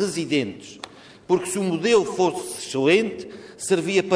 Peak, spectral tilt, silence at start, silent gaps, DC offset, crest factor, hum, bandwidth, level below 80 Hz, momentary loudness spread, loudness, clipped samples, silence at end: -6 dBFS; -4.5 dB/octave; 0 s; none; under 0.1%; 18 dB; none; 11 kHz; -62 dBFS; 19 LU; -22 LUFS; under 0.1%; 0 s